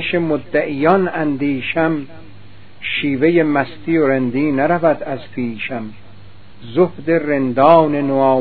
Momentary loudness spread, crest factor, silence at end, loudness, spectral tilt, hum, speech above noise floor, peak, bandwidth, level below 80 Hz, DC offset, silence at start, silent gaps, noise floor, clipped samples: 12 LU; 16 dB; 0 s; -16 LUFS; -10 dB/octave; none; 27 dB; 0 dBFS; 4.7 kHz; -52 dBFS; 2%; 0 s; none; -42 dBFS; under 0.1%